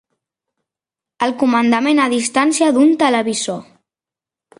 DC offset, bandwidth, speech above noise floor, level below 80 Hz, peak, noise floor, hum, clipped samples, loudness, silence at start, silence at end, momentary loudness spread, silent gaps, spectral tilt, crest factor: under 0.1%; 11.5 kHz; 74 dB; -64 dBFS; -2 dBFS; -89 dBFS; none; under 0.1%; -15 LUFS; 1.2 s; 0.95 s; 9 LU; none; -3 dB/octave; 16 dB